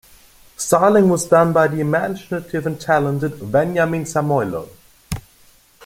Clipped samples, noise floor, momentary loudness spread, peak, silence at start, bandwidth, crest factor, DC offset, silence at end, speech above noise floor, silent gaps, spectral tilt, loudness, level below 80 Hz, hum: under 0.1%; -51 dBFS; 15 LU; -2 dBFS; 0.6 s; 17 kHz; 18 dB; under 0.1%; 0.65 s; 34 dB; none; -6 dB/octave; -18 LUFS; -48 dBFS; none